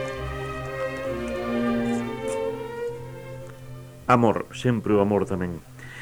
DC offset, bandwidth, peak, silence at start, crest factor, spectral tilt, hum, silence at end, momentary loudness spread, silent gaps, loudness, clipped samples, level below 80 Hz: under 0.1%; over 20 kHz; -4 dBFS; 0 s; 22 dB; -7 dB/octave; none; 0 s; 18 LU; none; -26 LUFS; under 0.1%; -46 dBFS